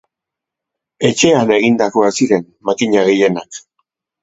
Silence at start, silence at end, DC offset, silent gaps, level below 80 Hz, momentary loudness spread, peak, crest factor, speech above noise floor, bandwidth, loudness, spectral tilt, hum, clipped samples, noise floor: 1 s; 0.65 s; under 0.1%; none; -56 dBFS; 10 LU; 0 dBFS; 16 dB; 70 dB; 8.2 kHz; -14 LUFS; -4.5 dB/octave; none; under 0.1%; -83 dBFS